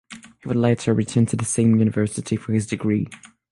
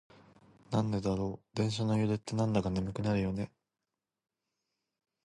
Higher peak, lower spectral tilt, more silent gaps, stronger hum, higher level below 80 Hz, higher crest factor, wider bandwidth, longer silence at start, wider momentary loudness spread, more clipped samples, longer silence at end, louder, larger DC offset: first, -6 dBFS vs -16 dBFS; about the same, -6.5 dB/octave vs -7 dB/octave; neither; neither; about the same, -52 dBFS vs -56 dBFS; about the same, 16 dB vs 18 dB; about the same, 11.5 kHz vs 11.5 kHz; second, 0.1 s vs 0.7 s; first, 9 LU vs 5 LU; neither; second, 0.35 s vs 1.75 s; first, -21 LUFS vs -33 LUFS; neither